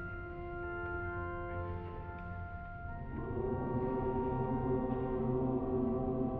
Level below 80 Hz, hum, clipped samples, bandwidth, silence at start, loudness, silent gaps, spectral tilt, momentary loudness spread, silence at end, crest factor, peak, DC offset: -48 dBFS; none; under 0.1%; 4.1 kHz; 0 s; -38 LUFS; none; -9 dB/octave; 10 LU; 0 s; 14 dB; -22 dBFS; under 0.1%